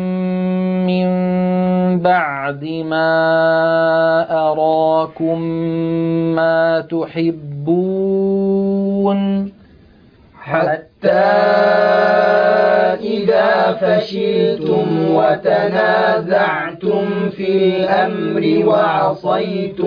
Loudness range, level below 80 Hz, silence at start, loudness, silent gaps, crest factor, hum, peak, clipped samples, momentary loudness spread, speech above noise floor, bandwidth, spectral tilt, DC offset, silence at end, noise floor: 4 LU; -56 dBFS; 0 s; -15 LUFS; none; 12 dB; none; -2 dBFS; under 0.1%; 7 LU; 31 dB; 5.2 kHz; -9 dB/octave; under 0.1%; 0 s; -46 dBFS